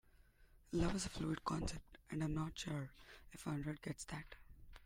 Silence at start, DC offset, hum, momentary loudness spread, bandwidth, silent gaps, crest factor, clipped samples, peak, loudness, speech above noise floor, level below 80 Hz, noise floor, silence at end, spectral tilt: 0.4 s; under 0.1%; none; 18 LU; 16 kHz; none; 20 dB; under 0.1%; -24 dBFS; -44 LUFS; 24 dB; -56 dBFS; -68 dBFS; 0 s; -5.5 dB/octave